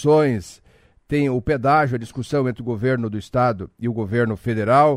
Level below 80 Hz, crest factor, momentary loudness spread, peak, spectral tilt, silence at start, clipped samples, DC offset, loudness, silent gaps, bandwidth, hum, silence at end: -46 dBFS; 16 dB; 9 LU; -4 dBFS; -7.5 dB/octave; 0 s; under 0.1%; under 0.1%; -21 LUFS; none; 13 kHz; none; 0 s